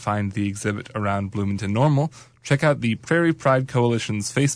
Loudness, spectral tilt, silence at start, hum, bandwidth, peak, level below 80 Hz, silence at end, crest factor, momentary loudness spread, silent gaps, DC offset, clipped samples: -22 LUFS; -6 dB/octave; 0 s; none; 11 kHz; -8 dBFS; -56 dBFS; 0 s; 14 dB; 7 LU; none; under 0.1%; under 0.1%